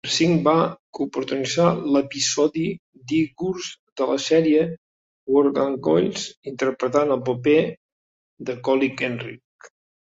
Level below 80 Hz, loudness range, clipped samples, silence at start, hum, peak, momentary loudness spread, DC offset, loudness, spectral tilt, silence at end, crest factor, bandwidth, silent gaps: -62 dBFS; 2 LU; under 0.1%; 0.05 s; none; -4 dBFS; 13 LU; under 0.1%; -22 LUFS; -5 dB/octave; 0.45 s; 18 dB; 8 kHz; 0.79-0.93 s, 2.79-2.93 s, 3.79-3.96 s, 4.78-5.27 s, 6.37-6.43 s, 7.77-8.37 s, 9.44-9.59 s